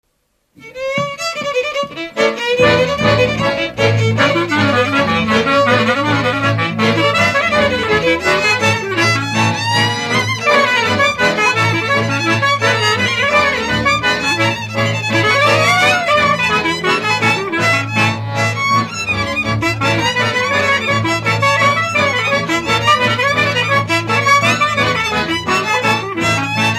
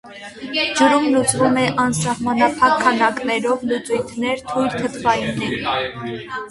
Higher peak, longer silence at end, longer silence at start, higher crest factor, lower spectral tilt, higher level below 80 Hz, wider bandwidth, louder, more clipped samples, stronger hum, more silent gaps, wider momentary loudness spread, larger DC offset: about the same, 0 dBFS vs 0 dBFS; about the same, 0 s vs 0 s; first, 0.6 s vs 0.05 s; about the same, 14 dB vs 18 dB; about the same, -4 dB/octave vs -4 dB/octave; first, -44 dBFS vs -50 dBFS; first, 14.5 kHz vs 11.5 kHz; first, -13 LUFS vs -18 LUFS; neither; neither; neither; second, 5 LU vs 9 LU; neither